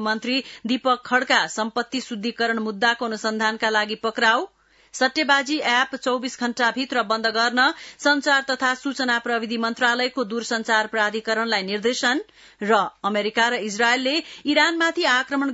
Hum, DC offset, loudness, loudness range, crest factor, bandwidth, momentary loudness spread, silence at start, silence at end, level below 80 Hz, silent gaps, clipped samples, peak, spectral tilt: none; under 0.1%; -21 LUFS; 2 LU; 18 dB; 8 kHz; 7 LU; 0 s; 0 s; -70 dBFS; none; under 0.1%; -4 dBFS; -2.5 dB/octave